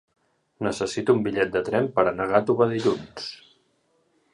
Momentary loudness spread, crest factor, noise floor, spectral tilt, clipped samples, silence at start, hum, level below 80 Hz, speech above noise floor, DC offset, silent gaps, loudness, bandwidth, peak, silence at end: 10 LU; 20 dB; -68 dBFS; -6 dB/octave; under 0.1%; 0.6 s; none; -58 dBFS; 44 dB; under 0.1%; none; -24 LUFS; 11 kHz; -4 dBFS; 1 s